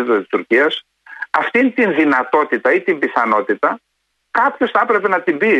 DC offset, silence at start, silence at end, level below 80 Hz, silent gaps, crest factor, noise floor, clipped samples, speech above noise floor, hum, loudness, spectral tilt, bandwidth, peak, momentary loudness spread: under 0.1%; 0 s; 0 s; -66 dBFS; none; 14 dB; -69 dBFS; under 0.1%; 54 dB; none; -16 LUFS; -6 dB/octave; 9.4 kHz; -2 dBFS; 6 LU